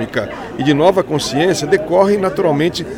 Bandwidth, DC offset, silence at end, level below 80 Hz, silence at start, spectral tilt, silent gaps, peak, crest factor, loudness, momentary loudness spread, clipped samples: 17 kHz; under 0.1%; 0 s; -44 dBFS; 0 s; -5 dB/octave; none; 0 dBFS; 14 dB; -15 LUFS; 8 LU; under 0.1%